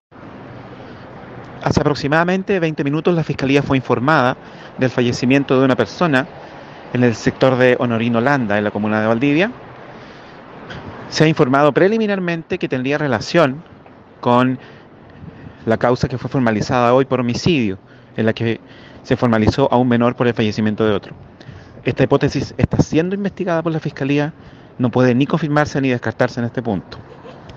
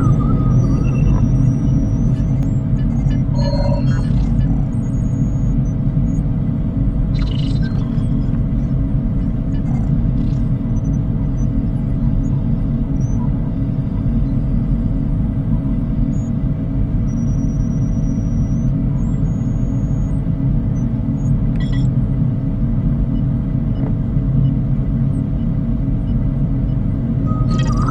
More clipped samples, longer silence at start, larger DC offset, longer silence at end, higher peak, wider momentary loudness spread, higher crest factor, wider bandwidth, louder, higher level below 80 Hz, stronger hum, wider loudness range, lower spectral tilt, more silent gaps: neither; first, 0.15 s vs 0 s; neither; about the same, 0 s vs 0 s; about the same, 0 dBFS vs -2 dBFS; first, 21 LU vs 3 LU; about the same, 18 dB vs 14 dB; first, 8.2 kHz vs 7.2 kHz; about the same, -17 LUFS vs -18 LUFS; second, -46 dBFS vs -22 dBFS; neither; about the same, 3 LU vs 2 LU; second, -6.5 dB/octave vs -9.5 dB/octave; neither